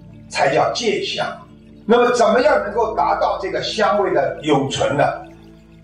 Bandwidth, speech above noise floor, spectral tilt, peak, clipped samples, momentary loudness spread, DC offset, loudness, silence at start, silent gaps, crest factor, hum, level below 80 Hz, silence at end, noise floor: 10.5 kHz; 26 dB; -4.5 dB/octave; -4 dBFS; under 0.1%; 10 LU; under 0.1%; -18 LUFS; 0.05 s; none; 14 dB; none; -48 dBFS; 0.35 s; -43 dBFS